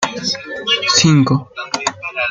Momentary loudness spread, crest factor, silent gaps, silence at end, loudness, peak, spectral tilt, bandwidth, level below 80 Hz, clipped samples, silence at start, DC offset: 10 LU; 16 dB; none; 0 s; -15 LUFS; 0 dBFS; -3.5 dB/octave; 9.6 kHz; -52 dBFS; under 0.1%; 0 s; under 0.1%